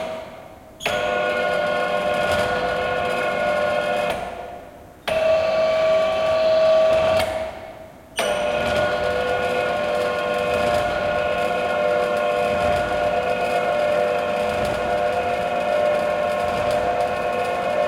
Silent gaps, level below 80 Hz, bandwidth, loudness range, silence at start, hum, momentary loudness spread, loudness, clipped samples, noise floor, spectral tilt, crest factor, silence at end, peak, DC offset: none; -48 dBFS; 16 kHz; 3 LU; 0 s; none; 7 LU; -21 LUFS; under 0.1%; -41 dBFS; -4 dB/octave; 14 dB; 0 s; -8 dBFS; under 0.1%